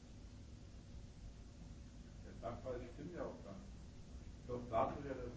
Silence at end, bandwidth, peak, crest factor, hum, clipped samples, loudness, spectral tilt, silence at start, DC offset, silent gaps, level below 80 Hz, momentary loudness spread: 0 s; 8 kHz; -24 dBFS; 24 dB; none; under 0.1%; -49 LUFS; -7 dB/octave; 0 s; under 0.1%; none; -58 dBFS; 17 LU